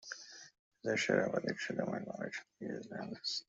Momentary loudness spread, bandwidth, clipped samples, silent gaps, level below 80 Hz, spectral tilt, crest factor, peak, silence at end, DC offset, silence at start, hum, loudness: 15 LU; 8.2 kHz; under 0.1%; 0.59-0.71 s; -78 dBFS; -4 dB/octave; 24 dB; -16 dBFS; 0.05 s; under 0.1%; 0 s; none; -38 LUFS